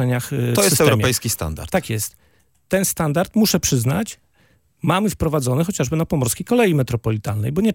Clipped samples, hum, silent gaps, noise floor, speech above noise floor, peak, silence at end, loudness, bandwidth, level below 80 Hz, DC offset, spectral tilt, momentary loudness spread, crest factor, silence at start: under 0.1%; none; none; -59 dBFS; 40 dB; 0 dBFS; 0 s; -19 LUFS; 17 kHz; -44 dBFS; under 0.1%; -5 dB/octave; 8 LU; 20 dB; 0 s